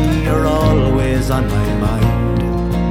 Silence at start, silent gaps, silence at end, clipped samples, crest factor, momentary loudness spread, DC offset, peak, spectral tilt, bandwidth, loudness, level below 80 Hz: 0 s; none; 0 s; under 0.1%; 12 dB; 4 LU; under 0.1%; -2 dBFS; -7.5 dB/octave; 16 kHz; -16 LUFS; -22 dBFS